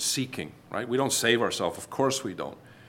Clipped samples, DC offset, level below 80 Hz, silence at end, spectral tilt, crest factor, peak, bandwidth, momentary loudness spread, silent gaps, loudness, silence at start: under 0.1%; under 0.1%; -68 dBFS; 0 s; -3 dB/octave; 20 dB; -8 dBFS; 17 kHz; 14 LU; none; -27 LUFS; 0 s